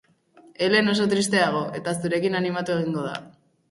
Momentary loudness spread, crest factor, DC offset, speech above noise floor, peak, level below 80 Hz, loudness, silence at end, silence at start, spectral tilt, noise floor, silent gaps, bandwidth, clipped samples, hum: 9 LU; 18 dB; under 0.1%; 31 dB; -6 dBFS; -66 dBFS; -23 LUFS; 0.4 s; 0.6 s; -4.5 dB/octave; -54 dBFS; none; 11.5 kHz; under 0.1%; none